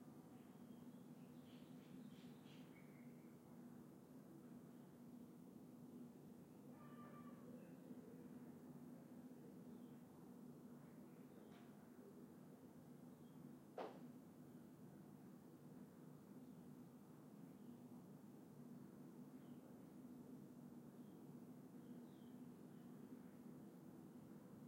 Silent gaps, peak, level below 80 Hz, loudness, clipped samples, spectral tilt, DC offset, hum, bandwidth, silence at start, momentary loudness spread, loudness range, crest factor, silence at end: none; -40 dBFS; under -90 dBFS; -61 LUFS; under 0.1%; -7 dB/octave; under 0.1%; none; 16 kHz; 0 s; 3 LU; 2 LU; 20 dB; 0 s